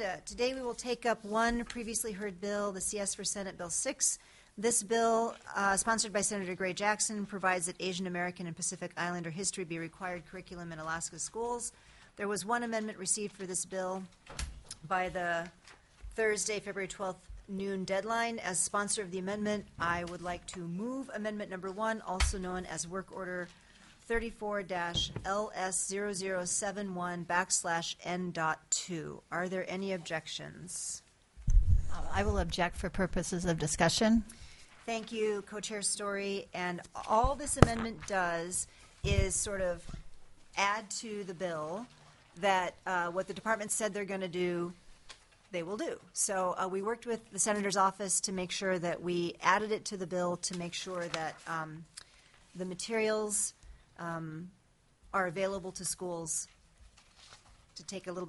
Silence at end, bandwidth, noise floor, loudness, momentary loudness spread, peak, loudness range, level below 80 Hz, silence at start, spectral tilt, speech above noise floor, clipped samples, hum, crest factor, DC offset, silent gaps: 0 s; 11.5 kHz; -65 dBFS; -34 LUFS; 12 LU; -2 dBFS; 6 LU; -46 dBFS; 0 s; -3.5 dB/octave; 31 dB; under 0.1%; none; 34 dB; under 0.1%; none